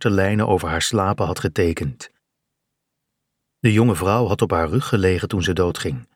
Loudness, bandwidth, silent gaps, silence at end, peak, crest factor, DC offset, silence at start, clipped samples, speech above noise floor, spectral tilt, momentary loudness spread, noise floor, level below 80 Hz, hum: -20 LUFS; 16.5 kHz; none; 0.15 s; -4 dBFS; 18 dB; under 0.1%; 0 s; under 0.1%; 59 dB; -5.5 dB/octave; 5 LU; -78 dBFS; -42 dBFS; none